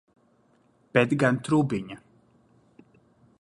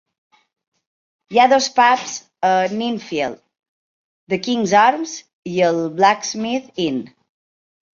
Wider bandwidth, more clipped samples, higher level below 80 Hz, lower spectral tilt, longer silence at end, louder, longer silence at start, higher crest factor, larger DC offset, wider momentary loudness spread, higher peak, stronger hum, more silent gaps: first, 11.5 kHz vs 7.4 kHz; neither; about the same, -64 dBFS vs -66 dBFS; first, -7 dB/octave vs -3.5 dB/octave; first, 1.45 s vs 0.85 s; second, -25 LUFS vs -18 LUFS; second, 0.95 s vs 1.3 s; first, 24 dB vs 18 dB; neither; first, 17 LU vs 12 LU; about the same, -4 dBFS vs -2 dBFS; neither; second, none vs 3.69-4.27 s, 5.33-5.43 s